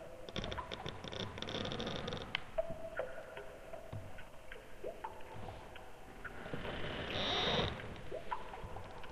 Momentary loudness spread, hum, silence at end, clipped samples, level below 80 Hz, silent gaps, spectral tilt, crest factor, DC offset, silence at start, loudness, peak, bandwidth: 15 LU; none; 0 s; under 0.1%; -54 dBFS; none; -4.5 dB/octave; 26 dB; under 0.1%; 0 s; -42 LUFS; -18 dBFS; 15 kHz